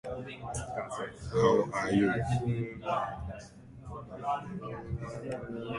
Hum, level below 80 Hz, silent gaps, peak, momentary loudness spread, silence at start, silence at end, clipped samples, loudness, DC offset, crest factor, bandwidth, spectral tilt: none; -52 dBFS; none; -12 dBFS; 17 LU; 0.05 s; 0 s; under 0.1%; -33 LUFS; under 0.1%; 20 dB; 11.5 kHz; -6.5 dB/octave